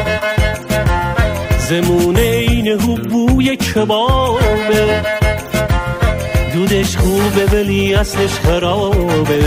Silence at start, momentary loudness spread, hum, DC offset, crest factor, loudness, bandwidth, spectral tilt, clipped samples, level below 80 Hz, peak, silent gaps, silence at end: 0 s; 4 LU; none; under 0.1%; 12 dB; -14 LUFS; 16 kHz; -5.5 dB/octave; under 0.1%; -22 dBFS; -2 dBFS; none; 0 s